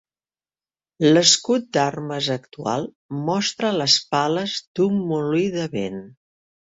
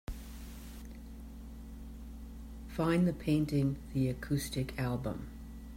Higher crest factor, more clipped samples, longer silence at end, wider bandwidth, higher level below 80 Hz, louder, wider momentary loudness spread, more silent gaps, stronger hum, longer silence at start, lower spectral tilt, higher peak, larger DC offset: first, 22 dB vs 16 dB; neither; first, 0.65 s vs 0 s; second, 8 kHz vs 16 kHz; second, -64 dBFS vs -48 dBFS; first, -20 LUFS vs -34 LUFS; second, 12 LU vs 19 LU; first, 2.95-3.09 s, 4.67-4.75 s vs none; neither; first, 1 s vs 0.1 s; second, -3.5 dB/octave vs -7 dB/octave; first, 0 dBFS vs -18 dBFS; neither